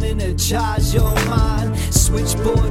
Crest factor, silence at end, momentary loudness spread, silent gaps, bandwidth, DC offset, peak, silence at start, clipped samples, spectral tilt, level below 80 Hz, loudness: 16 dB; 0 s; 3 LU; none; 16.5 kHz; under 0.1%; 0 dBFS; 0 s; under 0.1%; -4.5 dB/octave; -20 dBFS; -18 LUFS